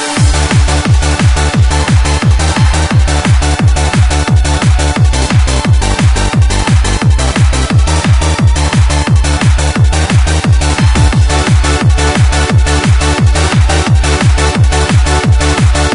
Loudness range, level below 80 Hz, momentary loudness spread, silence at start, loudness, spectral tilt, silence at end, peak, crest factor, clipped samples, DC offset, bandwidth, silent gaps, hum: 1 LU; -12 dBFS; 1 LU; 0 s; -10 LUFS; -5 dB/octave; 0 s; 0 dBFS; 8 dB; under 0.1%; under 0.1%; 11 kHz; none; none